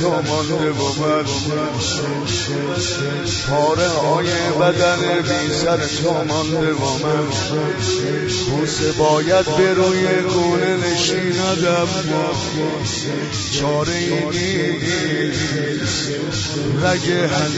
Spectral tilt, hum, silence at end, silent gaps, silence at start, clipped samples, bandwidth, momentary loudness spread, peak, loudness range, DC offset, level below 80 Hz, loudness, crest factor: -4.5 dB/octave; none; 0 s; none; 0 s; under 0.1%; 8 kHz; 5 LU; -2 dBFS; 3 LU; under 0.1%; -44 dBFS; -18 LUFS; 16 dB